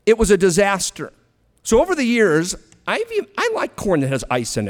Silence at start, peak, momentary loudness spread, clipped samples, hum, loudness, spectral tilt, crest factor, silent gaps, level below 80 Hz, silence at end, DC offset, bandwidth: 0.05 s; -2 dBFS; 11 LU; under 0.1%; none; -18 LUFS; -4.5 dB/octave; 16 dB; none; -38 dBFS; 0 s; under 0.1%; 17.5 kHz